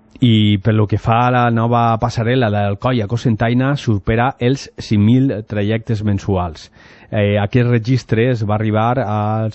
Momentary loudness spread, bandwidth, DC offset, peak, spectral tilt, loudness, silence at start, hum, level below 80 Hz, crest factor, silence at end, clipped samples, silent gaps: 6 LU; 8 kHz; under 0.1%; -2 dBFS; -7.5 dB/octave; -16 LUFS; 0.2 s; none; -40 dBFS; 12 dB; 0 s; under 0.1%; none